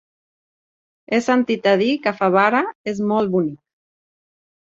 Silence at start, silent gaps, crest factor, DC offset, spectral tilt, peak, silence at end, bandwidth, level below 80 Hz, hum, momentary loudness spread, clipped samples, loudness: 1.1 s; 2.75-2.84 s; 20 dB; under 0.1%; -6 dB/octave; -2 dBFS; 1.15 s; 7.8 kHz; -64 dBFS; none; 7 LU; under 0.1%; -19 LUFS